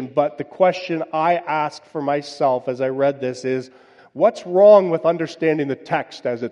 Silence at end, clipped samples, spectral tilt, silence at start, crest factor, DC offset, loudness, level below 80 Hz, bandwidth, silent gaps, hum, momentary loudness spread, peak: 0 s; under 0.1%; -6.5 dB/octave; 0 s; 18 dB; under 0.1%; -19 LUFS; -72 dBFS; 9.4 kHz; none; none; 12 LU; -2 dBFS